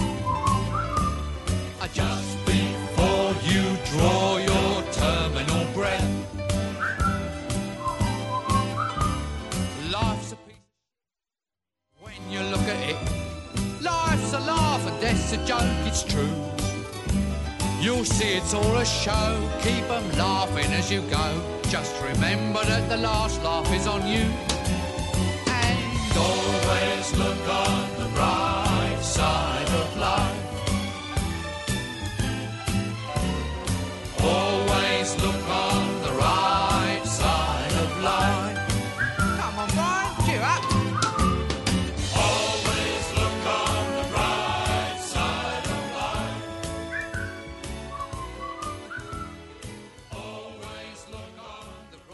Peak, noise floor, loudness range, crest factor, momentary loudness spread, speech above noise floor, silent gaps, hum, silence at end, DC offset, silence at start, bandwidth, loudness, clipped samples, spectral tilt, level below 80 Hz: -8 dBFS; under -90 dBFS; 8 LU; 18 dB; 11 LU; over 66 dB; none; none; 0 s; under 0.1%; 0 s; 12 kHz; -25 LUFS; under 0.1%; -4.5 dB/octave; -36 dBFS